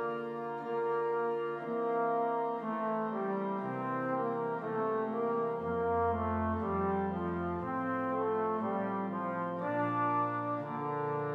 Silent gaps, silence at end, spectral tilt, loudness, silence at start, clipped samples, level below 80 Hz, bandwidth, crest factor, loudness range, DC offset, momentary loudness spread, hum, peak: none; 0 s; -9.5 dB/octave; -34 LUFS; 0 s; under 0.1%; -60 dBFS; 5 kHz; 12 dB; 1 LU; under 0.1%; 4 LU; none; -22 dBFS